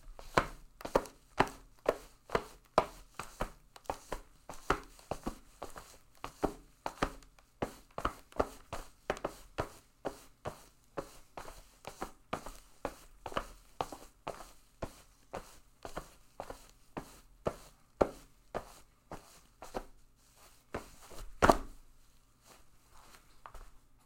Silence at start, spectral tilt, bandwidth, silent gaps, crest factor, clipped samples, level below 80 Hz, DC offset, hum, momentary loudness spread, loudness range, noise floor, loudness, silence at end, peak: 0 s; -4.5 dB/octave; 16.5 kHz; none; 34 dB; under 0.1%; -52 dBFS; under 0.1%; none; 21 LU; 10 LU; -63 dBFS; -40 LUFS; 0.3 s; -8 dBFS